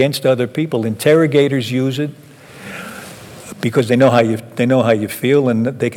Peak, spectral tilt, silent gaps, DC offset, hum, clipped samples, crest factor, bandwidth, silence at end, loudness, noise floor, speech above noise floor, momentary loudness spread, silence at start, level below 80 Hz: -2 dBFS; -6.5 dB/octave; none; under 0.1%; none; under 0.1%; 14 dB; 18 kHz; 0 s; -15 LUFS; -35 dBFS; 20 dB; 19 LU; 0 s; -60 dBFS